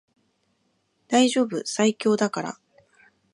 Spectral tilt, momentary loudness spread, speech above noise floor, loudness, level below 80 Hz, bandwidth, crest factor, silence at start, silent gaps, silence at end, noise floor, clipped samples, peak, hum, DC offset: -4 dB/octave; 13 LU; 48 dB; -23 LUFS; -78 dBFS; 11.5 kHz; 20 dB; 1.1 s; none; 0.8 s; -70 dBFS; under 0.1%; -6 dBFS; none; under 0.1%